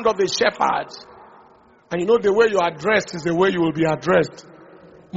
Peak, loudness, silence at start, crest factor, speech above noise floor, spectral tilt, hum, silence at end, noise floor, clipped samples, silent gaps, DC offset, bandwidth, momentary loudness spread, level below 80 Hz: -4 dBFS; -19 LUFS; 0 s; 18 dB; 32 dB; -3.5 dB/octave; none; 0 s; -52 dBFS; under 0.1%; none; under 0.1%; 8 kHz; 10 LU; -56 dBFS